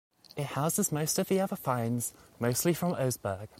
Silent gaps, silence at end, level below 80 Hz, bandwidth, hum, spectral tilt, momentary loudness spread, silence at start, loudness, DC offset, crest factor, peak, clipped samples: none; 0.15 s; -64 dBFS; 16.5 kHz; none; -5 dB/octave; 8 LU; 0.35 s; -31 LUFS; under 0.1%; 16 dB; -14 dBFS; under 0.1%